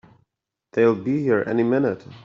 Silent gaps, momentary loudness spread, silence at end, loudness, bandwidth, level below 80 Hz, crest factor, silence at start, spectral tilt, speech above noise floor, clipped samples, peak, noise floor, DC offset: none; 5 LU; 0.05 s; -21 LUFS; 7 kHz; -64 dBFS; 16 dB; 0.75 s; -9 dB/octave; 61 dB; under 0.1%; -6 dBFS; -81 dBFS; under 0.1%